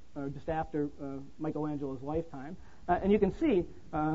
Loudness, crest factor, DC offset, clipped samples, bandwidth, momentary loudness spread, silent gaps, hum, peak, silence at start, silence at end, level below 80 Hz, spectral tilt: -33 LUFS; 18 dB; 0.5%; under 0.1%; 7.8 kHz; 15 LU; none; none; -14 dBFS; 0.15 s; 0 s; -52 dBFS; -9 dB/octave